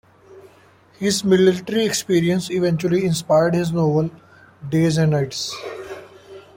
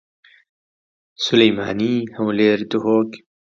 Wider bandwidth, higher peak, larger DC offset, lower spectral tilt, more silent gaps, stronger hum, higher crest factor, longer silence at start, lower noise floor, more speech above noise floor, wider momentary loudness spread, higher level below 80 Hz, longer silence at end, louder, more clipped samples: first, 16.5 kHz vs 7.4 kHz; second, -4 dBFS vs 0 dBFS; neither; about the same, -5.5 dB/octave vs -5.5 dB/octave; neither; neither; about the same, 16 dB vs 20 dB; second, 0.3 s vs 1.2 s; second, -51 dBFS vs under -90 dBFS; second, 33 dB vs over 72 dB; first, 15 LU vs 7 LU; about the same, -56 dBFS vs -60 dBFS; second, 0.15 s vs 0.35 s; about the same, -19 LUFS vs -18 LUFS; neither